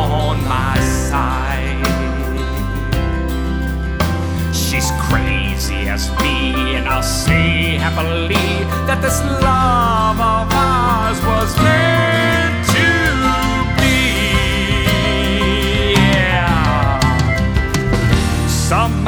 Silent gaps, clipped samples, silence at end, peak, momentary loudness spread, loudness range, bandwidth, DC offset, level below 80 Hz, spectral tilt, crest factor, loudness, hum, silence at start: none; under 0.1%; 0 s; 0 dBFS; 6 LU; 5 LU; over 20 kHz; under 0.1%; -22 dBFS; -5 dB/octave; 14 dB; -15 LUFS; none; 0 s